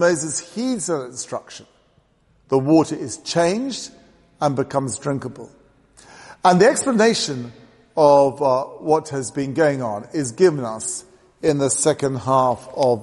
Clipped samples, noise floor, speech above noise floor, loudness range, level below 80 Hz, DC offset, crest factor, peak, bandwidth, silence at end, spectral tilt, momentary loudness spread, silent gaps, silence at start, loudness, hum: under 0.1%; -59 dBFS; 40 dB; 5 LU; -60 dBFS; under 0.1%; 20 dB; 0 dBFS; 11.5 kHz; 0 s; -4.5 dB/octave; 14 LU; none; 0 s; -20 LUFS; none